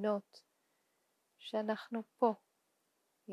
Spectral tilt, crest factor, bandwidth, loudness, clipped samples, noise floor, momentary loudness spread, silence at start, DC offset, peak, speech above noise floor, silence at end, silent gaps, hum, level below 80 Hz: -6.5 dB/octave; 24 dB; 13 kHz; -38 LUFS; under 0.1%; -80 dBFS; 12 LU; 0 s; under 0.1%; -18 dBFS; 43 dB; 0 s; none; none; under -90 dBFS